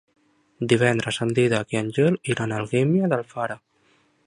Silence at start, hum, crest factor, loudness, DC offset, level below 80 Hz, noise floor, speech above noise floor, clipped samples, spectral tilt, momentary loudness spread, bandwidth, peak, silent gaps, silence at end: 0.6 s; none; 20 dB; -23 LUFS; under 0.1%; -60 dBFS; -63 dBFS; 41 dB; under 0.1%; -6 dB/octave; 10 LU; 11 kHz; -4 dBFS; none; 0.7 s